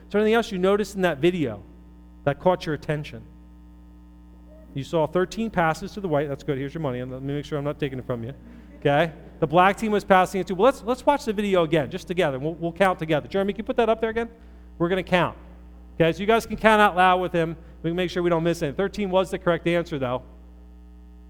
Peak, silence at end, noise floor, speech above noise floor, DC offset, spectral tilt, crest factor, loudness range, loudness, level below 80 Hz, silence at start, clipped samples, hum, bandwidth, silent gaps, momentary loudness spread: -2 dBFS; 0 s; -47 dBFS; 24 dB; under 0.1%; -6 dB/octave; 22 dB; 7 LU; -23 LUFS; -46 dBFS; 0 s; under 0.1%; none; 18.5 kHz; none; 11 LU